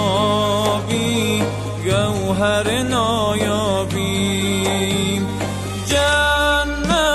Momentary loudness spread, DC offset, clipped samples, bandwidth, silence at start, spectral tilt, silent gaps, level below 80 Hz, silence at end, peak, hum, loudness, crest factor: 5 LU; under 0.1%; under 0.1%; 12.5 kHz; 0 s; -4.5 dB/octave; none; -34 dBFS; 0 s; -6 dBFS; none; -18 LUFS; 14 dB